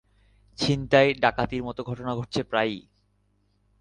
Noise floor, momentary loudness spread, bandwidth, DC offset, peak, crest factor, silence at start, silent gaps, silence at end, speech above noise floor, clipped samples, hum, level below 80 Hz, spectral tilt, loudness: -68 dBFS; 12 LU; 10 kHz; under 0.1%; -6 dBFS; 22 dB; 0.6 s; none; 1 s; 43 dB; under 0.1%; 50 Hz at -50 dBFS; -52 dBFS; -5.5 dB/octave; -25 LUFS